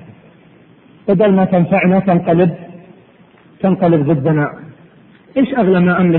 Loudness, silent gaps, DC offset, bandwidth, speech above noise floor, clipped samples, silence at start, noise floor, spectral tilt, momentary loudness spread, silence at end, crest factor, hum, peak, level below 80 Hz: -14 LUFS; none; under 0.1%; 4.1 kHz; 34 dB; under 0.1%; 0.1 s; -46 dBFS; -13 dB/octave; 8 LU; 0 s; 14 dB; none; -2 dBFS; -50 dBFS